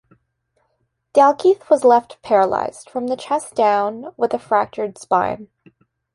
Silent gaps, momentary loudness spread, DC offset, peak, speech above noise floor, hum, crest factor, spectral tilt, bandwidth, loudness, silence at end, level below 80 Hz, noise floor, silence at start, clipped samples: none; 11 LU; under 0.1%; -2 dBFS; 52 dB; none; 16 dB; -5 dB/octave; 11.5 kHz; -18 LUFS; 0.7 s; -62 dBFS; -69 dBFS; 1.15 s; under 0.1%